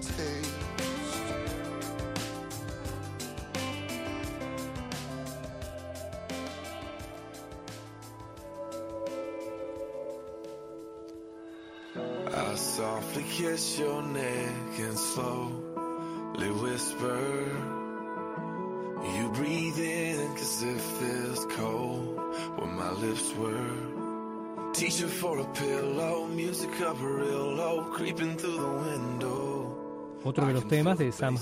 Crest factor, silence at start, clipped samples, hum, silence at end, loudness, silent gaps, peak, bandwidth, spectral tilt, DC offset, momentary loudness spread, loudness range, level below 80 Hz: 18 dB; 0 s; under 0.1%; none; 0 s; -33 LUFS; none; -14 dBFS; 16 kHz; -4.5 dB/octave; under 0.1%; 12 LU; 9 LU; -56 dBFS